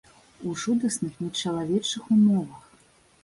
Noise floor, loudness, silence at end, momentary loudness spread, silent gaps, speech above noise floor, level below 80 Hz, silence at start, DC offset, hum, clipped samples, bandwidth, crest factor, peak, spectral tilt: -59 dBFS; -25 LUFS; 0.65 s; 13 LU; none; 34 dB; -64 dBFS; 0.4 s; under 0.1%; none; under 0.1%; 11.5 kHz; 14 dB; -12 dBFS; -5 dB/octave